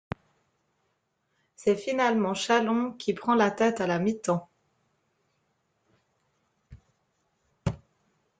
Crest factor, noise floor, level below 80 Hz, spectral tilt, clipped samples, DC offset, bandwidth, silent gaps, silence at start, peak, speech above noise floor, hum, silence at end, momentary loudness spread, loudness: 20 dB; -76 dBFS; -58 dBFS; -5.5 dB/octave; under 0.1%; under 0.1%; 9.4 kHz; none; 1.6 s; -10 dBFS; 50 dB; none; 0.65 s; 11 LU; -27 LUFS